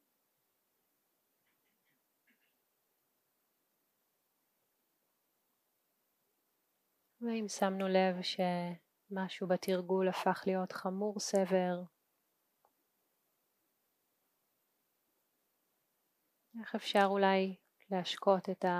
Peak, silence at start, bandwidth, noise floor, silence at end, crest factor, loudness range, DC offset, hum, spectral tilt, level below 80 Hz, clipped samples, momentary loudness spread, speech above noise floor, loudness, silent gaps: -16 dBFS; 7.2 s; 15.5 kHz; -81 dBFS; 0 s; 24 dB; 8 LU; under 0.1%; none; -5 dB/octave; under -90 dBFS; under 0.1%; 13 LU; 47 dB; -35 LUFS; none